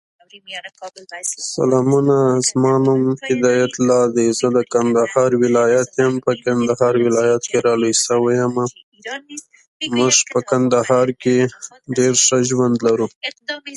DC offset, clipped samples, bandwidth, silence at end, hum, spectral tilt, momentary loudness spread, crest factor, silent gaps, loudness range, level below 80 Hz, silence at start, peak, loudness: under 0.1%; under 0.1%; 11.5 kHz; 0 s; none; -4 dB/octave; 16 LU; 16 dB; 8.83-8.92 s, 9.67-9.80 s, 13.16-13.21 s; 2 LU; -60 dBFS; 0.35 s; -2 dBFS; -16 LUFS